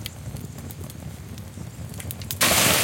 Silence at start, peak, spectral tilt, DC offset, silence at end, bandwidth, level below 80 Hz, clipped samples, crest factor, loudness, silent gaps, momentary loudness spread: 0 s; -2 dBFS; -2 dB/octave; under 0.1%; 0 s; 17 kHz; -46 dBFS; under 0.1%; 26 dB; -21 LUFS; none; 20 LU